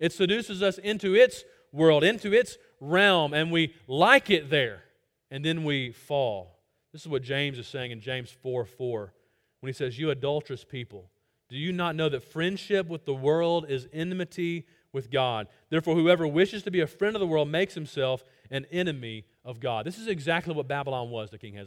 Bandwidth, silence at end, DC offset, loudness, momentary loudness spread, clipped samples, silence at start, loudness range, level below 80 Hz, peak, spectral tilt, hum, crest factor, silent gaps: 16 kHz; 0 s; under 0.1%; -27 LUFS; 17 LU; under 0.1%; 0 s; 10 LU; -66 dBFS; -2 dBFS; -5.5 dB/octave; none; 26 dB; none